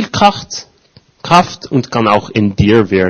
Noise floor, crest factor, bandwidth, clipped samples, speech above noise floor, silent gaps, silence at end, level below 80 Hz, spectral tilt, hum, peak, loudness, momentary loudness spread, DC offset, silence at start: -48 dBFS; 12 dB; 11 kHz; 0.7%; 36 dB; none; 0 s; -38 dBFS; -5.5 dB/octave; none; 0 dBFS; -12 LUFS; 14 LU; under 0.1%; 0 s